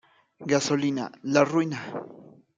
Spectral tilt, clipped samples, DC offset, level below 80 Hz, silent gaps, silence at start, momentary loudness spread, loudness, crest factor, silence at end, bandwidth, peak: -5 dB/octave; under 0.1%; under 0.1%; -72 dBFS; none; 0.4 s; 16 LU; -25 LUFS; 20 dB; 0.3 s; 9.4 kHz; -6 dBFS